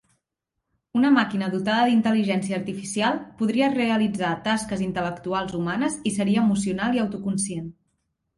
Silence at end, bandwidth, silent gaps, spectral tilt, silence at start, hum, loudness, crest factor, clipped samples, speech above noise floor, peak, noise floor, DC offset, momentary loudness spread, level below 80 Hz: 0.65 s; 11.5 kHz; none; -5 dB/octave; 0.95 s; none; -24 LUFS; 16 dB; under 0.1%; 59 dB; -8 dBFS; -82 dBFS; under 0.1%; 9 LU; -58 dBFS